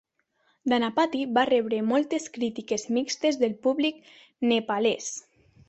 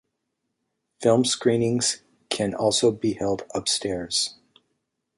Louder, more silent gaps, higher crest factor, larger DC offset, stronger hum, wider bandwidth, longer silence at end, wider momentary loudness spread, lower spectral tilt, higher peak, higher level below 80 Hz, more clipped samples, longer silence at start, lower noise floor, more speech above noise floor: second, -26 LUFS vs -23 LUFS; neither; about the same, 18 dB vs 20 dB; neither; neither; second, 8.2 kHz vs 11.5 kHz; second, 0.5 s vs 0.85 s; about the same, 8 LU vs 7 LU; about the same, -3.5 dB/octave vs -3.5 dB/octave; about the same, -8 dBFS vs -6 dBFS; second, -70 dBFS vs -58 dBFS; neither; second, 0.65 s vs 1 s; second, -70 dBFS vs -79 dBFS; second, 44 dB vs 56 dB